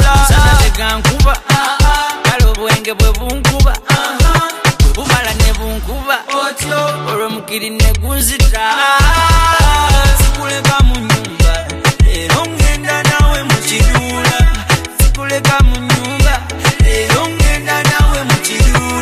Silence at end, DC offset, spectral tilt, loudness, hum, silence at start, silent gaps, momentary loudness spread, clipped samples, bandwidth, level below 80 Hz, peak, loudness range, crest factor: 0 s; under 0.1%; -4 dB/octave; -12 LUFS; none; 0 s; none; 6 LU; under 0.1%; 15.5 kHz; -14 dBFS; 0 dBFS; 3 LU; 10 dB